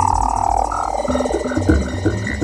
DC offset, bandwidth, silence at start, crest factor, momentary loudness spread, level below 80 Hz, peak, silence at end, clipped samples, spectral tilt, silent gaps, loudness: under 0.1%; 12.5 kHz; 0 s; 16 dB; 3 LU; -26 dBFS; -2 dBFS; 0 s; under 0.1%; -6 dB/octave; none; -19 LUFS